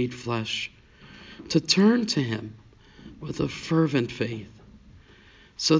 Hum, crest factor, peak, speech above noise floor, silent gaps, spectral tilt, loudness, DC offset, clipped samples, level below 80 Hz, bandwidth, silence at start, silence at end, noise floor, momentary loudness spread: none; 20 dB; -6 dBFS; 28 dB; none; -5 dB/octave; -25 LUFS; under 0.1%; under 0.1%; -56 dBFS; 7.8 kHz; 0 s; 0 s; -53 dBFS; 24 LU